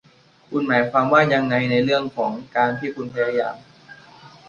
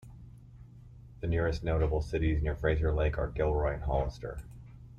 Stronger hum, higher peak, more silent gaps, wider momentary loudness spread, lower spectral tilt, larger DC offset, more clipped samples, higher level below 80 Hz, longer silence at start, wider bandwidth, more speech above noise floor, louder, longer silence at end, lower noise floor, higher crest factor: neither; first, -2 dBFS vs -16 dBFS; neither; second, 12 LU vs 21 LU; about the same, -7 dB/octave vs -8 dB/octave; neither; neither; second, -60 dBFS vs -38 dBFS; first, 0.5 s vs 0.05 s; about the same, 7.2 kHz vs 7 kHz; first, 26 dB vs 21 dB; first, -20 LUFS vs -32 LUFS; first, 0.2 s vs 0 s; second, -46 dBFS vs -51 dBFS; about the same, 20 dB vs 16 dB